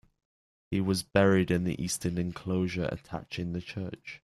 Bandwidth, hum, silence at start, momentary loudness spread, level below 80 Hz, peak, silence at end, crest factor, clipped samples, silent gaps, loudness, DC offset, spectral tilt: 13.5 kHz; none; 0.7 s; 14 LU; -56 dBFS; -8 dBFS; 0.2 s; 22 dB; under 0.1%; none; -30 LUFS; under 0.1%; -5.5 dB/octave